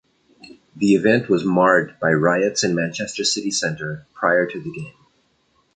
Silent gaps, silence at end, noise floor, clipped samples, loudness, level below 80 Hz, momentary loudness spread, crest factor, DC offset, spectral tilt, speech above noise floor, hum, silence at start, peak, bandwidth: none; 0.85 s; -63 dBFS; under 0.1%; -19 LUFS; -60 dBFS; 14 LU; 18 dB; under 0.1%; -4.5 dB/octave; 44 dB; none; 0.45 s; -2 dBFS; 9.6 kHz